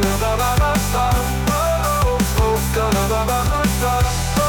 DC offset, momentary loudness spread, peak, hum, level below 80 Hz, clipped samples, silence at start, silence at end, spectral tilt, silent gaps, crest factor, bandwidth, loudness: under 0.1%; 1 LU; -8 dBFS; none; -24 dBFS; under 0.1%; 0 s; 0 s; -4.5 dB/octave; none; 10 dB; 19.5 kHz; -18 LUFS